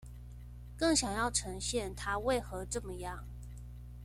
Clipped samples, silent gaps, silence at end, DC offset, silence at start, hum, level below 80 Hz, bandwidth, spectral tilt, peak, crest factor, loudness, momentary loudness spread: under 0.1%; none; 0 s; under 0.1%; 0 s; 60 Hz at -45 dBFS; -48 dBFS; 16 kHz; -3.5 dB/octave; -16 dBFS; 20 dB; -34 LUFS; 20 LU